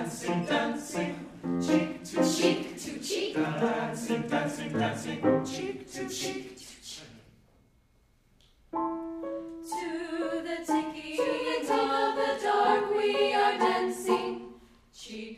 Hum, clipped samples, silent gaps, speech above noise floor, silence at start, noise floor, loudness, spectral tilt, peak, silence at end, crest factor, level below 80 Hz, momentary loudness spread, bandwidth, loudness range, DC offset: none; under 0.1%; none; 36 dB; 0 s; -65 dBFS; -30 LUFS; -4.5 dB/octave; -12 dBFS; 0 s; 20 dB; -64 dBFS; 13 LU; 15.5 kHz; 12 LU; under 0.1%